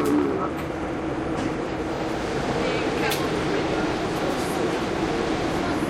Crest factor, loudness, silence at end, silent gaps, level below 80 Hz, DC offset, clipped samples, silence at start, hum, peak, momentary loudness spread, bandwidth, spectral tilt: 14 dB; -25 LUFS; 0 s; none; -42 dBFS; under 0.1%; under 0.1%; 0 s; none; -10 dBFS; 4 LU; 15.5 kHz; -5.5 dB/octave